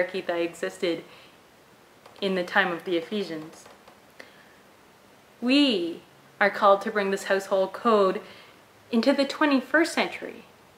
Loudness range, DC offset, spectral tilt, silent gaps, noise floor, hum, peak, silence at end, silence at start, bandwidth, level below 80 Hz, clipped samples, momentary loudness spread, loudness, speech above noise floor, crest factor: 6 LU; under 0.1%; -4.5 dB/octave; none; -55 dBFS; none; -6 dBFS; 0.35 s; 0 s; 16 kHz; -74 dBFS; under 0.1%; 14 LU; -25 LUFS; 30 dB; 20 dB